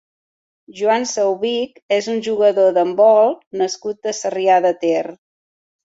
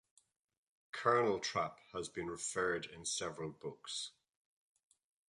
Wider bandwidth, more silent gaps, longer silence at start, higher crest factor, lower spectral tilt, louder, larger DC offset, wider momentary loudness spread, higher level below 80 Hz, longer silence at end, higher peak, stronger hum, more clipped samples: second, 8 kHz vs 11.5 kHz; first, 1.82-1.89 s, 3.47-3.51 s vs none; second, 0.7 s vs 0.95 s; second, 16 dB vs 22 dB; about the same, -3.5 dB/octave vs -3 dB/octave; first, -17 LUFS vs -39 LUFS; neither; second, 10 LU vs 13 LU; about the same, -68 dBFS vs -72 dBFS; second, 0.7 s vs 1.2 s; first, -2 dBFS vs -18 dBFS; neither; neither